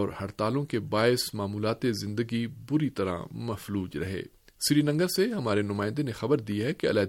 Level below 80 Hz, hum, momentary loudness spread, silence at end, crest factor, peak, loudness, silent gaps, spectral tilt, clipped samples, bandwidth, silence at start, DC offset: -60 dBFS; none; 9 LU; 0 s; 18 dB; -10 dBFS; -29 LUFS; none; -5.5 dB/octave; under 0.1%; 17 kHz; 0 s; under 0.1%